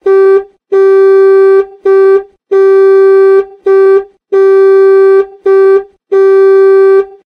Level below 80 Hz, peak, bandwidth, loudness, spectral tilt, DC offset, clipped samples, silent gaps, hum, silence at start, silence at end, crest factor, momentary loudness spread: -58 dBFS; 0 dBFS; 4.5 kHz; -6 LUFS; -5.5 dB/octave; under 0.1%; under 0.1%; none; none; 0.05 s; 0.2 s; 6 dB; 7 LU